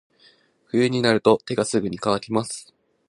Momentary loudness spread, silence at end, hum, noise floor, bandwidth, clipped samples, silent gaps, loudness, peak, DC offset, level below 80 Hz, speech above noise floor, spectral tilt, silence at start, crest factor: 8 LU; 0.45 s; none; -57 dBFS; 11.5 kHz; under 0.1%; none; -22 LUFS; -2 dBFS; under 0.1%; -60 dBFS; 36 dB; -5 dB/octave; 0.75 s; 20 dB